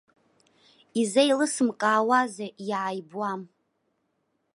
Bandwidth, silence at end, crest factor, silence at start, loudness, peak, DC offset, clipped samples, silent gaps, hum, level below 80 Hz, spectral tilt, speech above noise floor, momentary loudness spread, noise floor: 11.5 kHz; 1.1 s; 20 dB; 0.95 s; -25 LUFS; -8 dBFS; under 0.1%; under 0.1%; none; none; -82 dBFS; -3.5 dB/octave; 50 dB; 11 LU; -75 dBFS